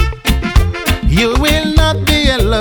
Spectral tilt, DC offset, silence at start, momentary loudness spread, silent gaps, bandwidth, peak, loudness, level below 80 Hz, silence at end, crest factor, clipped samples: -5 dB/octave; under 0.1%; 0 s; 4 LU; none; over 20 kHz; 0 dBFS; -13 LUFS; -16 dBFS; 0 s; 12 dB; 0.3%